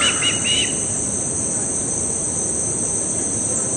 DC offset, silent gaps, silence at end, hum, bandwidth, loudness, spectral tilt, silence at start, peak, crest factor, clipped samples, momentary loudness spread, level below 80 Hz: under 0.1%; none; 0 s; none; 11.5 kHz; -18 LUFS; -1.5 dB/octave; 0 s; -6 dBFS; 14 dB; under 0.1%; 3 LU; -46 dBFS